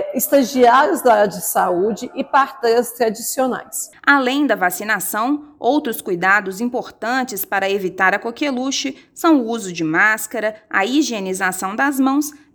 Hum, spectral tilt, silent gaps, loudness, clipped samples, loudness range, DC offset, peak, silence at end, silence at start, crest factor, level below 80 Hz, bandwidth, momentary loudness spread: none; -3 dB/octave; none; -18 LUFS; under 0.1%; 3 LU; under 0.1%; 0 dBFS; 0.2 s; 0 s; 18 dB; -62 dBFS; over 20 kHz; 8 LU